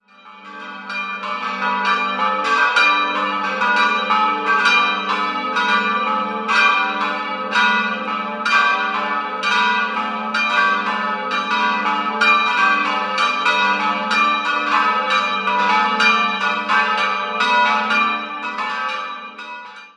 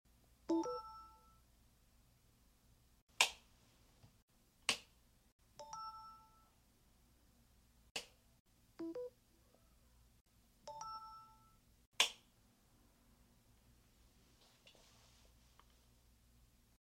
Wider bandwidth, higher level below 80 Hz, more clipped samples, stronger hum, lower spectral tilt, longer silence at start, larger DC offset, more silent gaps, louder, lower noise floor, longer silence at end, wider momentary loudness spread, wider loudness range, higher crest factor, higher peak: second, 11 kHz vs 16 kHz; about the same, -72 dBFS vs -74 dBFS; neither; neither; first, -2.5 dB/octave vs -1 dB/octave; second, 0.25 s vs 0.5 s; neither; second, none vs 3.02-3.07 s, 4.22-4.28 s, 5.32-5.39 s, 7.91-7.95 s, 8.40-8.45 s, 10.21-10.25 s, 11.87-11.92 s; first, -17 LUFS vs -41 LUFS; second, -41 dBFS vs -72 dBFS; second, 0.1 s vs 2.1 s; second, 10 LU vs 24 LU; second, 2 LU vs 12 LU; second, 18 dB vs 36 dB; first, -2 dBFS vs -14 dBFS